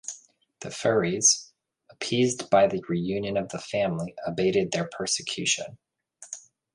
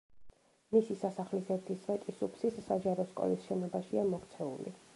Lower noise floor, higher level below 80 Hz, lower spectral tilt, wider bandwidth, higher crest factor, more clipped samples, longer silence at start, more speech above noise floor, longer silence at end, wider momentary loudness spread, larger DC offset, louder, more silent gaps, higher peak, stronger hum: first, -59 dBFS vs -55 dBFS; first, -62 dBFS vs -72 dBFS; second, -3 dB/octave vs -8 dB/octave; about the same, 11.5 kHz vs 11.5 kHz; about the same, 20 dB vs 20 dB; neither; about the same, 0.05 s vs 0.15 s; first, 34 dB vs 20 dB; first, 0.35 s vs 0.15 s; first, 20 LU vs 8 LU; neither; first, -25 LUFS vs -36 LUFS; neither; first, -8 dBFS vs -16 dBFS; neither